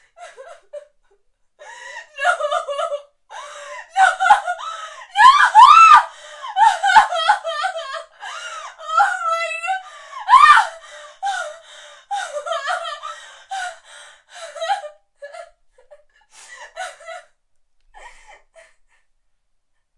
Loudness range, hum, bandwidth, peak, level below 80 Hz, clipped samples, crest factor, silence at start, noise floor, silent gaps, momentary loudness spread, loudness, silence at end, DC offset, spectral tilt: 19 LU; none; 11.5 kHz; 0 dBFS; -60 dBFS; under 0.1%; 18 dB; 0.2 s; -65 dBFS; none; 26 LU; -15 LUFS; 2.8 s; under 0.1%; 1.5 dB/octave